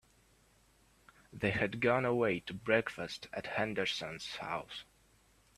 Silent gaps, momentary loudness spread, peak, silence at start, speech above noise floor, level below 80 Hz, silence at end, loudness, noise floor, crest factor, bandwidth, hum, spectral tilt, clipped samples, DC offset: none; 11 LU; -14 dBFS; 1.35 s; 33 dB; -66 dBFS; 0.75 s; -35 LUFS; -68 dBFS; 24 dB; 14 kHz; none; -5 dB/octave; under 0.1%; under 0.1%